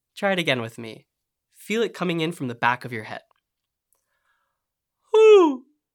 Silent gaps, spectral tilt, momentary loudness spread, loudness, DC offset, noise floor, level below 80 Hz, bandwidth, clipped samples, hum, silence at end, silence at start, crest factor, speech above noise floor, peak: none; -5.5 dB/octave; 23 LU; -20 LUFS; under 0.1%; -83 dBFS; -80 dBFS; 14 kHz; under 0.1%; none; 0.35 s; 0.15 s; 20 dB; 57 dB; -4 dBFS